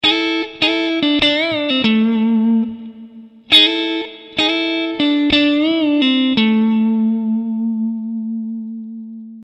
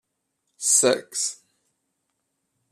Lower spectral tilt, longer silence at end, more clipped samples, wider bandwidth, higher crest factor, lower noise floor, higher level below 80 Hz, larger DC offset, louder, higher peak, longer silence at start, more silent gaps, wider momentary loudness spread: first, -5 dB/octave vs -1 dB/octave; second, 0 s vs 1.35 s; neither; second, 11 kHz vs 14.5 kHz; second, 16 dB vs 22 dB; second, -38 dBFS vs -77 dBFS; first, -52 dBFS vs -78 dBFS; neither; first, -15 LUFS vs -21 LUFS; first, 0 dBFS vs -6 dBFS; second, 0.05 s vs 0.6 s; neither; about the same, 12 LU vs 10 LU